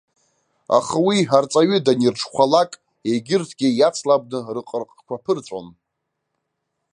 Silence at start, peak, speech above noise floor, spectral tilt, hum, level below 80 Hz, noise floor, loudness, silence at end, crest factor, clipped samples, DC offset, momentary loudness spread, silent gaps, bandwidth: 0.7 s; -2 dBFS; 59 dB; -5 dB/octave; 50 Hz at -65 dBFS; -66 dBFS; -78 dBFS; -19 LUFS; 1.25 s; 18 dB; under 0.1%; under 0.1%; 13 LU; none; 11 kHz